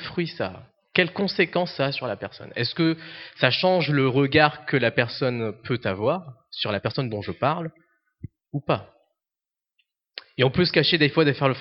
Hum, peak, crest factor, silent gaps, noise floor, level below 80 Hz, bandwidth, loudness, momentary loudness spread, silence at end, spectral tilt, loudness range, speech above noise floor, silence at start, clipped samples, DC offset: none; 0 dBFS; 24 dB; none; -90 dBFS; -60 dBFS; 6 kHz; -23 LUFS; 14 LU; 0 s; -8.5 dB/octave; 8 LU; 66 dB; 0 s; under 0.1%; under 0.1%